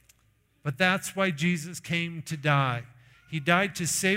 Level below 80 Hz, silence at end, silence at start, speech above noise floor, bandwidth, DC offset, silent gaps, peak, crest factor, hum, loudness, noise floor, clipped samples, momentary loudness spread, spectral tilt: -64 dBFS; 0 s; 0.65 s; 40 dB; 16 kHz; under 0.1%; none; -8 dBFS; 20 dB; none; -27 LUFS; -67 dBFS; under 0.1%; 11 LU; -4 dB/octave